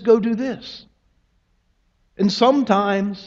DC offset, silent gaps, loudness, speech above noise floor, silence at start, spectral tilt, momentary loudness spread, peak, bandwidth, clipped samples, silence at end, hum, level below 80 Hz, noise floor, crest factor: under 0.1%; none; -19 LUFS; 46 dB; 0 s; -6 dB/octave; 18 LU; -2 dBFS; 7.6 kHz; under 0.1%; 0 s; none; -60 dBFS; -64 dBFS; 18 dB